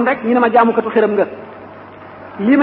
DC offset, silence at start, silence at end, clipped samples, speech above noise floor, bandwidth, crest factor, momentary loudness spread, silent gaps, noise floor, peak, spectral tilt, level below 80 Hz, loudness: under 0.1%; 0 s; 0 s; under 0.1%; 22 dB; 4.8 kHz; 14 dB; 23 LU; none; -35 dBFS; -2 dBFS; -11.5 dB/octave; -60 dBFS; -14 LUFS